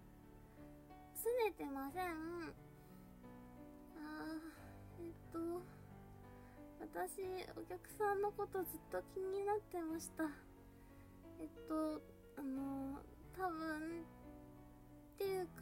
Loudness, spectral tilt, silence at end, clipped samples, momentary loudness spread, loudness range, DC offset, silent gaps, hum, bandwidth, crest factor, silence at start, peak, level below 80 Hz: -46 LUFS; -5 dB/octave; 0 s; under 0.1%; 19 LU; 8 LU; under 0.1%; none; none; 16 kHz; 18 dB; 0 s; -28 dBFS; -66 dBFS